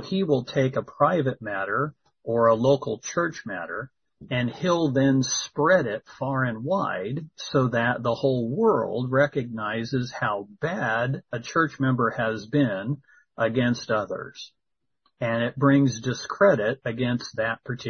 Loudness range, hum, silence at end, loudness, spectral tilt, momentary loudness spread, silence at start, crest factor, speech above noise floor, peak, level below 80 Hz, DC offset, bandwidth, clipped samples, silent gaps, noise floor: 2 LU; none; 0 s; -25 LUFS; -5.5 dB/octave; 11 LU; 0 s; 18 dB; 49 dB; -6 dBFS; -62 dBFS; under 0.1%; 6.6 kHz; under 0.1%; none; -74 dBFS